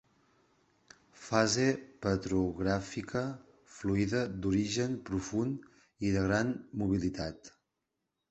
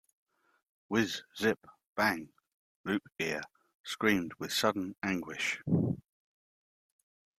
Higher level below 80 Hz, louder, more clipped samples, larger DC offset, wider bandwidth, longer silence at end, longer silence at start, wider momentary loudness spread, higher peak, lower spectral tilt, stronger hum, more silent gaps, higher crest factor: first, -54 dBFS vs -68 dBFS; about the same, -33 LUFS vs -33 LUFS; neither; neither; second, 8.4 kHz vs 15.5 kHz; second, 0.8 s vs 1.4 s; first, 1.2 s vs 0.9 s; about the same, 10 LU vs 12 LU; about the same, -10 dBFS vs -12 dBFS; about the same, -5.5 dB/octave vs -4.5 dB/octave; neither; second, none vs 1.87-1.95 s, 2.54-2.84 s, 3.74-3.84 s; about the same, 24 dB vs 24 dB